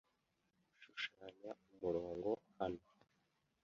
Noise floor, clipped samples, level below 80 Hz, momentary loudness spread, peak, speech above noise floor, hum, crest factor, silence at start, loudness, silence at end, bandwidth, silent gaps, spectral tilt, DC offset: -84 dBFS; under 0.1%; -74 dBFS; 12 LU; -26 dBFS; 39 dB; none; 20 dB; 0.8 s; -46 LUFS; 0.85 s; 7.2 kHz; none; -3.5 dB/octave; under 0.1%